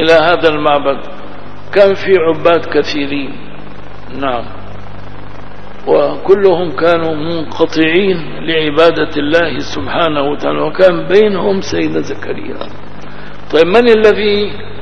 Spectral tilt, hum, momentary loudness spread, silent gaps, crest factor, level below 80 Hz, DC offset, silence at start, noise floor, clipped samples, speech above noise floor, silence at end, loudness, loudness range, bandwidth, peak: -6 dB/octave; 50 Hz at -35 dBFS; 22 LU; none; 14 dB; -40 dBFS; 10%; 0 s; -31 dBFS; 0.5%; 20 dB; 0 s; -12 LUFS; 5 LU; 8 kHz; 0 dBFS